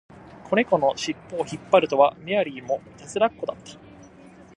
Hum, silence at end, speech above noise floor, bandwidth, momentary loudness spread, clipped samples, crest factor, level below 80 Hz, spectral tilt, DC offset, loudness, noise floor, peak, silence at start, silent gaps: none; 0.8 s; 25 dB; 11 kHz; 13 LU; under 0.1%; 22 dB; -60 dBFS; -4.5 dB/octave; under 0.1%; -24 LUFS; -48 dBFS; -4 dBFS; 0.45 s; none